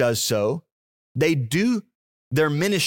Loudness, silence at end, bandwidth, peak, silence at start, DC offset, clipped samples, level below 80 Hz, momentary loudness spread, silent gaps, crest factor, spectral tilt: -23 LUFS; 0 s; 17 kHz; -8 dBFS; 0 s; under 0.1%; under 0.1%; -62 dBFS; 8 LU; 0.72-1.15 s, 1.95-2.31 s; 16 dB; -4.5 dB/octave